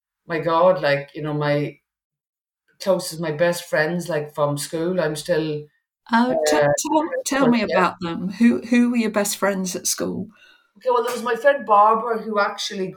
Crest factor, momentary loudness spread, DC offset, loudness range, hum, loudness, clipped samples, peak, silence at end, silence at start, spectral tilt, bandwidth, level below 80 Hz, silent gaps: 16 dB; 10 LU; under 0.1%; 5 LU; none; -21 LUFS; under 0.1%; -4 dBFS; 0 s; 0.3 s; -4.5 dB/octave; 18 kHz; -62 dBFS; 2.04-2.10 s, 2.29-2.33 s